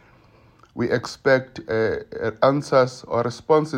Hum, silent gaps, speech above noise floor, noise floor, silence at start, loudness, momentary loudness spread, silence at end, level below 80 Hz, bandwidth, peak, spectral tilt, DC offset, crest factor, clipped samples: none; none; 32 dB; -53 dBFS; 0.75 s; -22 LUFS; 8 LU; 0 s; -56 dBFS; 10.5 kHz; -4 dBFS; -6 dB/octave; under 0.1%; 18 dB; under 0.1%